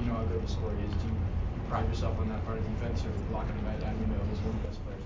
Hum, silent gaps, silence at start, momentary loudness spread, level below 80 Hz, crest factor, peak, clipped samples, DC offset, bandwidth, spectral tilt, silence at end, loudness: none; none; 0 s; 3 LU; -36 dBFS; 14 dB; -18 dBFS; under 0.1%; under 0.1%; 7.6 kHz; -8 dB/octave; 0 s; -34 LUFS